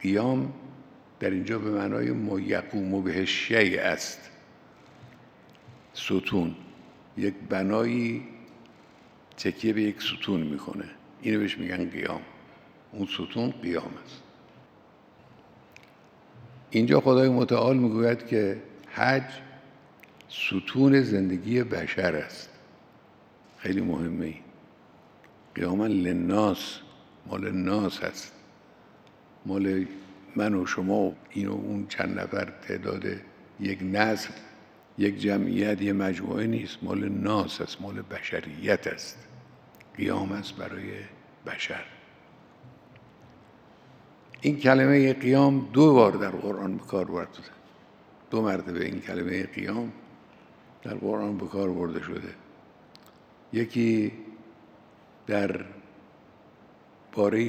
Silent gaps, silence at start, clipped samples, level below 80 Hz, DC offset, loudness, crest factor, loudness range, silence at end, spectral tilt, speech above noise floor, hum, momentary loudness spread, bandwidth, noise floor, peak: none; 0 s; under 0.1%; -68 dBFS; under 0.1%; -27 LUFS; 26 dB; 11 LU; 0 s; -6.5 dB/octave; 29 dB; none; 19 LU; 15 kHz; -56 dBFS; -4 dBFS